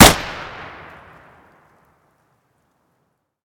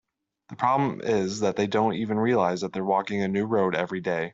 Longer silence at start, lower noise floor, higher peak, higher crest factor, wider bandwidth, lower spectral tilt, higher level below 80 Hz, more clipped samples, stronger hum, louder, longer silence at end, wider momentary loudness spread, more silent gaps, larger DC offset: second, 0 s vs 0.5 s; first, -69 dBFS vs -51 dBFS; first, 0 dBFS vs -8 dBFS; about the same, 20 dB vs 16 dB; first, 17.5 kHz vs 7.8 kHz; second, -3 dB/octave vs -6 dB/octave; first, -34 dBFS vs -66 dBFS; first, 0.2% vs under 0.1%; neither; first, -17 LUFS vs -25 LUFS; first, 3.05 s vs 0.05 s; first, 25 LU vs 4 LU; neither; neither